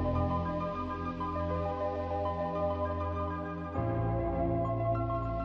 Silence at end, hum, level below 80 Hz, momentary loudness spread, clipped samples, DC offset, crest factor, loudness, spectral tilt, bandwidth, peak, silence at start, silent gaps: 0 s; none; -46 dBFS; 4 LU; under 0.1%; under 0.1%; 14 dB; -33 LUFS; -10 dB/octave; 6.4 kHz; -20 dBFS; 0 s; none